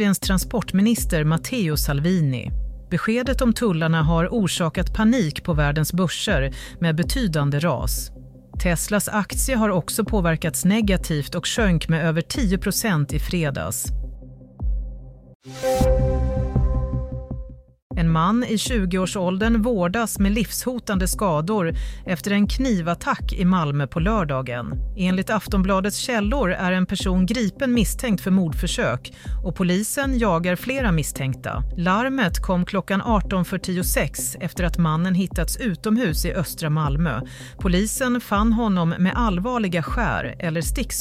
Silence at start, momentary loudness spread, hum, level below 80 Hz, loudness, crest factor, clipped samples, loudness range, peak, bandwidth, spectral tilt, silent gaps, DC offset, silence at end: 0 s; 8 LU; none; -30 dBFS; -22 LUFS; 14 dB; under 0.1%; 2 LU; -6 dBFS; 16 kHz; -5.5 dB/octave; 15.35-15.40 s, 17.82-17.90 s; under 0.1%; 0 s